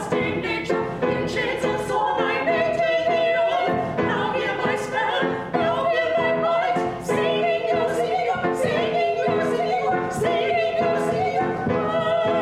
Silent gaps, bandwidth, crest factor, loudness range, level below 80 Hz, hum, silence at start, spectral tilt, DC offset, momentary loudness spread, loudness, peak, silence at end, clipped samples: none; 13.5 kHz; 14 dB; 1 LU; -54 dBFS; none; 0 s; -5.5 dB/octave; under 0.1%; 3 LU; -22 LUFS; -8 dBFS; 0 s; under 0.1%